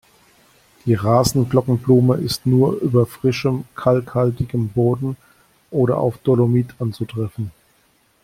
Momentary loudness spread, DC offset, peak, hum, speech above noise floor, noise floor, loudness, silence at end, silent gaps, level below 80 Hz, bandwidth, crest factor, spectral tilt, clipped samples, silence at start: 10 LU; under 0.1%; -2 dBFS; none; 42 dB; -59 dBFS; -19 LUFS; 0.75 s; none; -48 dBFS; 16 kHz; 18 dB; -7 dB/octave; under 0.1%; 0.85 s